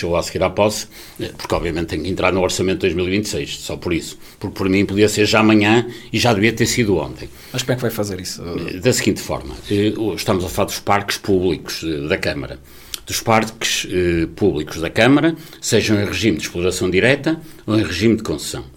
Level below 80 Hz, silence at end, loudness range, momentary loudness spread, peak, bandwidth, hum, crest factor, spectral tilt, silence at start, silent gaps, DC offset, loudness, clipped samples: -40 dBFS; 0.05 s; 4 LU; 12 LU; 0 dBFS; 17.5 kHz; none; 18 dB; -4.5 dB/octave; 0 s; none; under 0.1%; -18 LUFS; under 0.1%